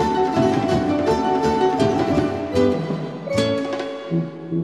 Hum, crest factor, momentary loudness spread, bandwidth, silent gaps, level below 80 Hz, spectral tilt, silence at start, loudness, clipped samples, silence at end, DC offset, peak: none; 14 dB; 7 LU; 12.5 kHz; none; -44 dBFS; -6.5 dB/octave; 0 s; -20 LUFS; under 0.1%; 0 s; 0.1%; -6 dBFS